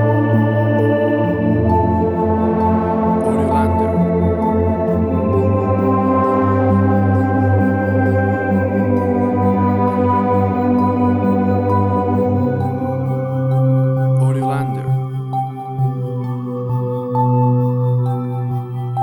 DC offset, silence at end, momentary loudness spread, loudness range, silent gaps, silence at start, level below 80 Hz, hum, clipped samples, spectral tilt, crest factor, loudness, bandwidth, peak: under 0.1%; 0 s; 6 LU; 3 LU; none; 0 s; -38 dBFS; none; under 0.1%; -10 dB/octave; 12 dB; -16 LUFS; 10 kHz; -2 dBFS